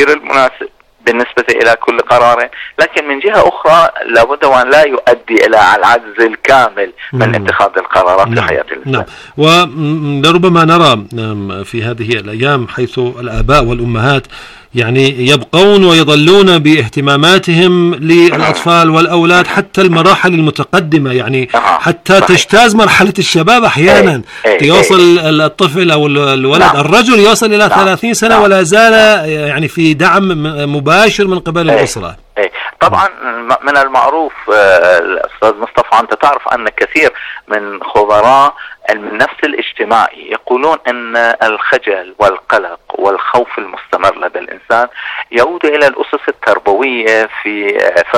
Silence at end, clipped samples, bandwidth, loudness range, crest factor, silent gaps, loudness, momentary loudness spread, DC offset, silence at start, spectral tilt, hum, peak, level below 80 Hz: 0 s; 0.6%; 16 kHz; 5 LU; 8 dB; none; -9 LUFS; 10 LU; under 0.1%; 0 s; -5 dB/octave; none; 0 dBFS; -34 dBFS